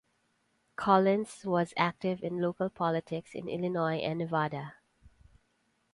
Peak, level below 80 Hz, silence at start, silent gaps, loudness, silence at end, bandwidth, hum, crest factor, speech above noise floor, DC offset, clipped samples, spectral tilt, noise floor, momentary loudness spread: -10 dBFS; -68 dBFS; 0.8 s; none; -31 LUFS; 0.85 s; 11.5 kHz; none; 22 dB; 44 dB; under 0.1%; under 0.1%; -7 dB/octave; -74 dBFS; 13 LU